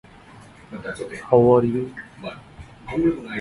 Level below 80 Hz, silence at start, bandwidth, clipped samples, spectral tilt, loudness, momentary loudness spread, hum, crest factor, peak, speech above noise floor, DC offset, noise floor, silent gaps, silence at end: -50 dBFS; 0.7 s; 11.5 kHz; under 0.1%; -8 dB/octave; -20 LUFS; 22 LU; none; 22 dB; -2 dBFS; 25 dB; under 0.1%; -46 dBFS; none; 0 s